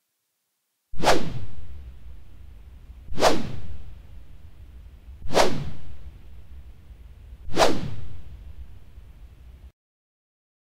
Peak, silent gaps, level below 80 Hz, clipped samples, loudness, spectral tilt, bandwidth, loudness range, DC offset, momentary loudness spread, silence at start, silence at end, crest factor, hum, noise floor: -4 dBFS; none; -42 dBFS; under 0.1%; -25 LUFS; -4 dB/octave; 16 kHz; 3 LU; under 0.1%; 26 LU; 0.95 s; 1.05 s; 20 dB; none; -76 dBFS